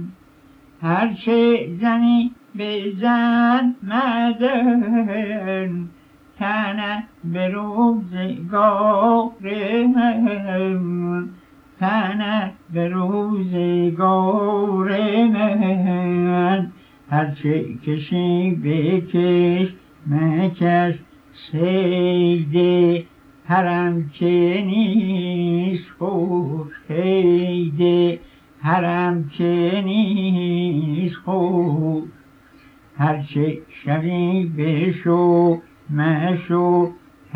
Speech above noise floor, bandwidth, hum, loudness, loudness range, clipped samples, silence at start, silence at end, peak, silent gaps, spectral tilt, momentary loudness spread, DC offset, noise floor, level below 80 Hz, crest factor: 31 dB; 5 kHz; none; -19 LUFS; 4 LU; under 0.1%; 0 s; 0.4 s; -4 dBFS; none; -9.5 dB/octave; 9 LU; under 0.1%; -50 dBFS; -60 dBFS; 14 dB